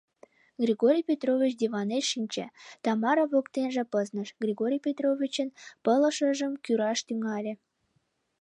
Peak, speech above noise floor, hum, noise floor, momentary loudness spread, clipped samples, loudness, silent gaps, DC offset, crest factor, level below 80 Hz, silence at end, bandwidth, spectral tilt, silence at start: -12 dBFS; 47 dB; none; -74 dBFS; 10 LU; under 0.1%; -28 LUFS; none; under 0.1%; 16 dB; -84 dBFS; 0.85 s; 10.5 kHz; -4 dB/octave; 0.6 s